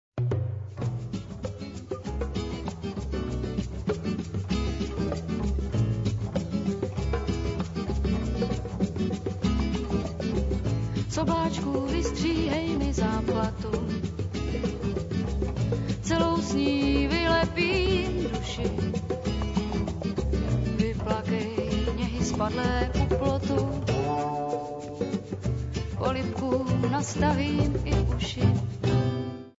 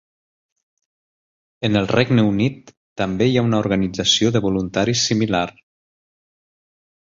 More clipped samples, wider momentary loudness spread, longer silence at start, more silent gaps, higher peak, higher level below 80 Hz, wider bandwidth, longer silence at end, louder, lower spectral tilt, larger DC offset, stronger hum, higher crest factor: neither; about the same, 7 LU vs 9 LU; second, 0.15 s vs 1.6 s; second, none vs 2.77-2.96 s; second, -10 dBFS vs -2 dBFS; first, -36 dBFS vs -48 dBFS; about the same, 8 kHz vs 7.8 kHz; second, 0.1 s vs 1.55 s; second, -28 LUFS vs -19 LUFS; first, -6.5 dB/octave vs -5 dB/octave; neither; neither; about the same, 18 dB vs 18 dB